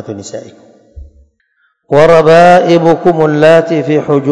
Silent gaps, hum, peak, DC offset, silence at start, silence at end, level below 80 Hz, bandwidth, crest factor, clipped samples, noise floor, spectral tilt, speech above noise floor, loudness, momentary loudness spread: none; none; 0 dBFS; under 0.1%; 0 s; 0 s; -40 dBFS; 11 kHz; 10 dB; 5%; -58 dBFS; -6.5 dB/octave; 51 dB; -7 LUFS; 19 LU